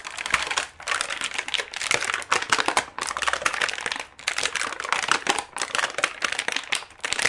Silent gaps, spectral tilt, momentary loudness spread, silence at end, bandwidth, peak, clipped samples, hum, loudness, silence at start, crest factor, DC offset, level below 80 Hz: none; 0.5 dB/octave; 5 LU; 0 s; 11.5 kHz; -2 dBFS; under 0.1%; none; -25 LUFS; 0 s; 26 dB; under 0.1%; -58 dBFS